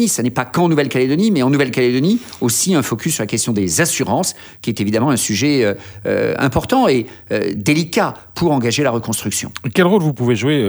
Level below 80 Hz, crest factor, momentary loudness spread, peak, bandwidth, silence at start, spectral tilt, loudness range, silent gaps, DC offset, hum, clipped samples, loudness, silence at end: -48 dBFS; 16 dB; 6 LU; 0 dBFS; over 20 kHz; 0 s; -4.5 dB/octave; 1 LU; none; under 0.1%; none; under 0.1%; -16 LUFS; 0 s